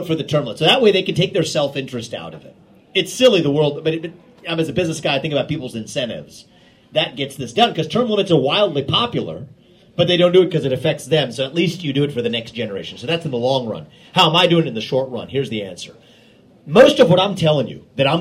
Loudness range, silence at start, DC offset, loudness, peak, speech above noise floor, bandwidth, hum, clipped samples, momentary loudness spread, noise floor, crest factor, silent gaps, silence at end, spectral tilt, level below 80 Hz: 4 LU; 0 s; under 0.1%; -17 LUFS; 0 dBFS; 31 dB; 15.5 kHz; none; under 0.1%; 14 LU; -49 dBFS; 18 dB; none; 0 s; -5 dB/octave; -56 dBFS